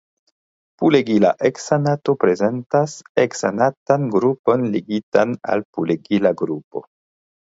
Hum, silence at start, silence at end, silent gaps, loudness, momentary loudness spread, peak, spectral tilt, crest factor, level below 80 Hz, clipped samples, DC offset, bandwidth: none; 0.8 s; 0.75 s; 3.09-3.15 s, 3.77-3.86 s, 4.39-4.44 s, 5.03-5.12 s, 5.65-5.73 s, 6.64-6.71 s; -19 LUFS; 6 LU; 0 dBFS; -6.5 dB/octave; 18 dB; -62 dBFS; under 0.1%; under 0.1%; 8 kHz